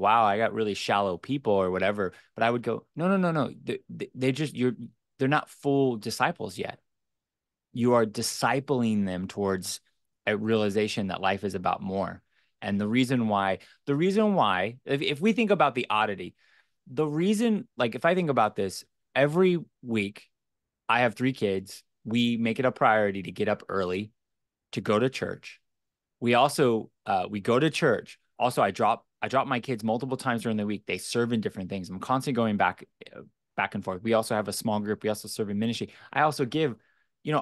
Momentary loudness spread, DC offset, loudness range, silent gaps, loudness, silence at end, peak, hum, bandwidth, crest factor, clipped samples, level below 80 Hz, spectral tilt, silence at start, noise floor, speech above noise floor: 12 LU; under 0.1%; 3 LU; none; -27 LUFS; 0 s; -8 dBFS; none; 12.5 kHz; 18 dB; under 0.1%; -70 dBFS; -5.5 dB/octave; 0 s; -89 dBFS; 62 dB